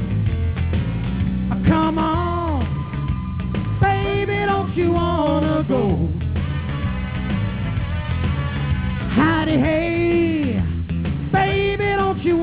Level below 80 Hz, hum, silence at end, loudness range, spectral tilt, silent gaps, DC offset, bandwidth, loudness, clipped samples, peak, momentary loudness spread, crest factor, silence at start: -28 dBFS; none; 0 s; 3 LU; -11.5 dB/octave; none; 0.4%; 4 kHz; -21 LUFS; under 0.1%; -6 dBFS; 6 LU; 14 dB; 0 s